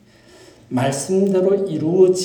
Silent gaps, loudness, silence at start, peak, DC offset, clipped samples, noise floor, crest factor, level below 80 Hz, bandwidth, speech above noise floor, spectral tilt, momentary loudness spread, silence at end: none; -18 LUFS; 0.7 s; -2 dBFS; under 0.1%; under 0.1%; -47 dBFS; 16 dB; -62 dBFS; 18.5 kHz; 30 dB; -6 dB/octave; 6 LU; 0 s